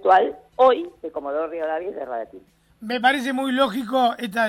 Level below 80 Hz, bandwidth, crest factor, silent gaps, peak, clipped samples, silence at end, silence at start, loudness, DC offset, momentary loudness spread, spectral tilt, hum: -62 dBFS; 15.5 kHz; 16 dB; none; -6 dBFS; under 0.1%; 0 s; 0 s; -22 LUFS; under 0.1%; 14 LU; -4 dB/octave; none